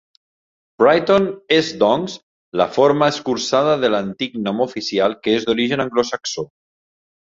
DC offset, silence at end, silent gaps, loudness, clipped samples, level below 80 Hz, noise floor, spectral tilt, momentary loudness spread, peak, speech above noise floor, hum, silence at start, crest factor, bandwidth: under 0.1%; 0.75 s; 2.23-2.52 s; -18 LUFS; under 0.1%; -58 dBFS; under -90 dBFS; -4.5 dB/octave; 10 LU; -2 dBFS; over 73 dB; none; 0.8 s; 16 dB; 7.8 kHz